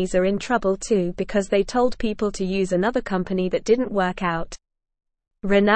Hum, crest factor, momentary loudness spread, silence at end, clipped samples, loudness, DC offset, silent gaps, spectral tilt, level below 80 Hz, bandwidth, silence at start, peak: none; 16 dB; 5 LU; 0 s; under 0.1%; -23 LUFS; 0.4%; none; -5.5 dB/octave; -42 dBFS; 8.8 kHz; 0 s; -6 dBFS